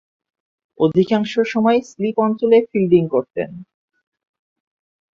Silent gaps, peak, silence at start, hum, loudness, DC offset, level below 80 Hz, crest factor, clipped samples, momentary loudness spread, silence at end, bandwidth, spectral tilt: none; -2 dBFS; 0.8 s; none; -17 LUFS; under 0.1%; -62 dBFS; 18 dB; under 0.1%; 8 LU; 1.5 s; 7.4 kHz; -7.5 dB/octave